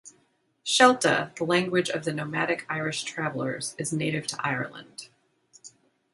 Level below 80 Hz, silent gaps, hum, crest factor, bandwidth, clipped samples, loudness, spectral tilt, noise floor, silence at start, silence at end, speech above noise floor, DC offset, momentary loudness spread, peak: -70 dBFS; none; none; 24 dB; 11.5 kHz; under 0.1%; -26 LUFS; -3.5 dB/octave; -68 dBFS; 0.05 s; 0.45 s; 42 dB; under 0.1%; 14 LU; -2 dBFS